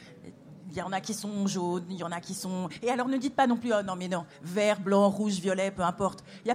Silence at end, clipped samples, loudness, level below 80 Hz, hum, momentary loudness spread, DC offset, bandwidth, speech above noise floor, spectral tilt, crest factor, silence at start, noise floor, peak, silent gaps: 0 s; under 0.1%; -30 LUFS; -66 dBFS; none; 12 LU; under 0.1%; 16 kHz; 20 dB; -5 dB/octave; 18 dB; 0 s; -49 dBFS; -12 dBFS; none